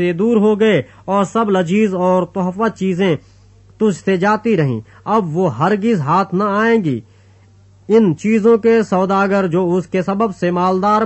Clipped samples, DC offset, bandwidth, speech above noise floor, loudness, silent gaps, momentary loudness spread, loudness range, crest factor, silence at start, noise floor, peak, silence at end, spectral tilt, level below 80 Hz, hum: under 0.1%; under 0.1%; 8.4 kHz; 32 dB; -15 LUFS; none; 6 LU; 2 LU; 14 dB; 0 s; -47 dBFS; -2 dBFS; 0 s; -7.5 dB/octave; -54 dBFS; none